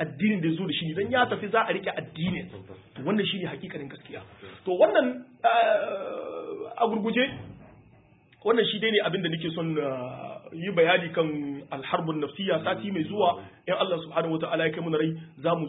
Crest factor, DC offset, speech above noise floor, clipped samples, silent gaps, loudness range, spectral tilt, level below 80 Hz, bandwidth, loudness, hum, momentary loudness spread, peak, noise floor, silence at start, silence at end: 20 dB; under 0.1%; 30 dB; under 0.1%; none; 3 LU; -10 dB/octave; -64 dBFS; 4 kHz; -27 LUFS; none; 15 LU; -8 dBFS; -58 dBFS; 0 s; 0 s